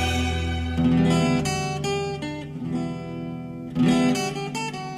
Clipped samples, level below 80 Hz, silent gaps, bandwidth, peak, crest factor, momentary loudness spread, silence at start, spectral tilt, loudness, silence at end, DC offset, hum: under 0.1%; -38 dBFS; none; 14 kHz; -10 dBFS; 14 dB; 13 LU; 0 s; -5.5 dB/octave; -25 LUFS; 0 s; under 0.1%; none